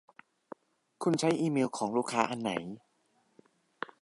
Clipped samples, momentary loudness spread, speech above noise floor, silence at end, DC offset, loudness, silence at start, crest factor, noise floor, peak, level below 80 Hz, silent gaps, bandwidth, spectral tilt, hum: under 0.1%; 24 LU; 42 dB; 1.25 s; under 0.1%; -31 LUFS; 1 s; 24 dB; -72 dBFS; -10 dBFS; -76 dBFS; none; 11.5 kHz; -5 dB/octave; none